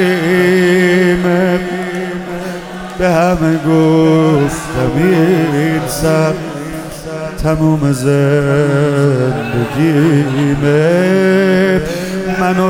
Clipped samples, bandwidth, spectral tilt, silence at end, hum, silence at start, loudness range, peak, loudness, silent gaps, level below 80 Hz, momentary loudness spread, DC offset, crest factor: under 0.1%; 17.5 kHz; -6.5 dB/octave; 0 s; none; 0 s; 2 LU; 0 dBFS; -12 LUFS; none; -34 dBFS; 12 LU; under 0.1%; 12 dB